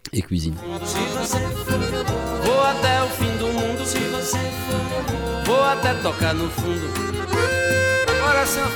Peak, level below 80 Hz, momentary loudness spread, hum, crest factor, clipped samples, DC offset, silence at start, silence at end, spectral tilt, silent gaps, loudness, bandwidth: -8 dBFS; -38 dBFS; 7 LU; none; 14 dB; under 0.1%; under 0.1%; 0.05 s; 0 s; -4 dB/octave; none; -21 LUFS; 19.5 kHz